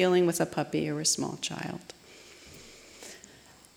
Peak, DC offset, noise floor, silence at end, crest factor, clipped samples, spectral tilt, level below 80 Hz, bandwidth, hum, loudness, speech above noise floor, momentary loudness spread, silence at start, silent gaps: -14 dBFS; under 0.1%; -55 dBFS; 0.6 s; 18 dB; under 0.1%; -4 dB/octave; -66 dBFS; 17 kHz; none; -29 LUFS; 27 dB; 23 LU; 0 s; none